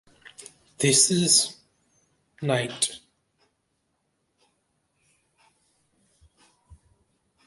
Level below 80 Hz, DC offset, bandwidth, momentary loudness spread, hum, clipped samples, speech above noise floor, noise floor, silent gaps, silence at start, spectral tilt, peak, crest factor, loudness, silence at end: -66 dBFS; under 0.1%; 12 kHz; 27 LU; none; under 0.1%; 52 dB; -75 dBFS; none; 0.8 s; -2.5 dB/octave; -6 dBFS; 24 dB; -21 LUFS; 0.7 s